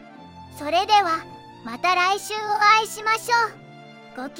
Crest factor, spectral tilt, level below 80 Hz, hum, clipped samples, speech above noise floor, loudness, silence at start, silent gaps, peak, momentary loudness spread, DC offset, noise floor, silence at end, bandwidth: 20 dB; -1.5 dB/octave; -68 dBFS; none; under 0.1%; 23 dB; -20 LUFS; 0 s; none; -4 dBFS; 21 LU; under 0.1%; -44 dBFS; 0 s; 17 kHz